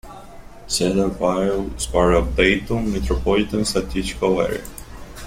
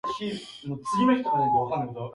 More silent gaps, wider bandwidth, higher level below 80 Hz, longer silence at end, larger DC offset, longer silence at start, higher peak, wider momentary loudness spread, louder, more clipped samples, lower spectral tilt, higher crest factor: neither; first, 16.5 kHz vs 11 kHz; first, -30 dBFS vs -60 dBFS; about the same, 0 s vs 0 s; neither; about the same, 0.05 s vs 0.05 s; first, -2 dBFS vs -10 dBFS; about the same, 11 LU vs 13 LU; first, -20 LUFS vs -26 LUFS; neither; second, -4.5 dB/octave vs -6.5 dB/octave; about the same, 18 dB vs 16 dB